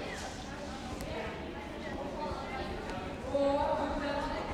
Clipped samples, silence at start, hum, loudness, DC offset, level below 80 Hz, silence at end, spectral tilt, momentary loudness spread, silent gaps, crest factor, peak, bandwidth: under 0.1%; 0 s; none; -36 LUFS; under 0.1%; -48 dBFS; 0 s; -5.5 dB/octave; 10 LU; none; 16 dB; -20 dBFS; 14.5 kHz